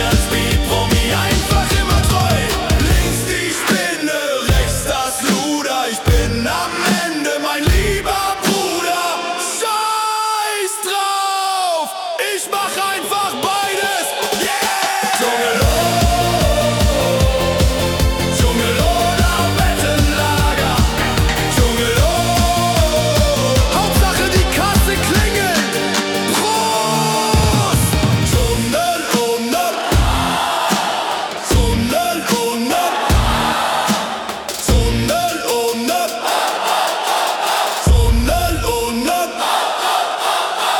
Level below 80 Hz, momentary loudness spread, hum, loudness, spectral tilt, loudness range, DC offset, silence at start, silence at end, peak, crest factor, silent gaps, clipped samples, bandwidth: -24 dBFS; 4 LU; none; -16 LUFS; -4 dB/octave; 3 LU; under 0.1%; 0 s; 0 s; -2 dBFS; 14 dB; none; under 0.1%; 18 kHz